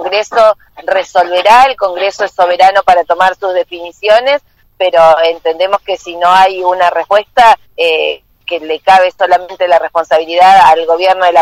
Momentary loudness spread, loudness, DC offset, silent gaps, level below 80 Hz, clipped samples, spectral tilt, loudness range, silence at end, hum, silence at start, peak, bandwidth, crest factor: 10 LU; -9 LUFS; under 0.1%; none; -46 dBFS; 2%; -2.5 dB/octave; 2 LU; 0 s; none; 0 s; 0 dBFS; 15.5 kHz; 10 dB